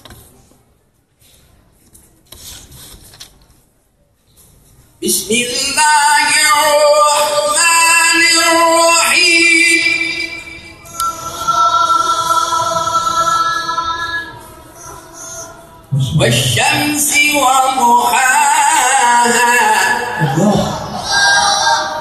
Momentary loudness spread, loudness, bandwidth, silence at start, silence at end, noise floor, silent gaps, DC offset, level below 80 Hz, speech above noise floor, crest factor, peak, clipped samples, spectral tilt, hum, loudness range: 16 LU; -11 LUFS; 13 kHz; 0.1 s; 0 s; -56 dBFS; none; under 0.1%; -46 dBFS; 45 dB; 14 dB; 0 dBFS; under 0.1%; -2 dB/octave; none; 9 LU